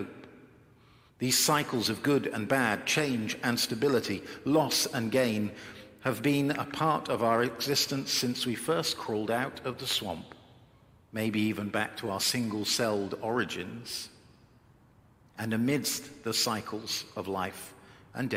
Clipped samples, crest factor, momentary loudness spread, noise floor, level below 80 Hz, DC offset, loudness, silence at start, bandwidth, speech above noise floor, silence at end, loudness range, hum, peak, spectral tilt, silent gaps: under 0.1%; 20 dB; 10 LU; -60 dBFS; -68 dBFS; under 0.1%; -30 LUFS; 0 s; 16.5 kHz; 30 dB; 0 s; 5 LU; none; -12 dBFS; -3.5 dB/octave; none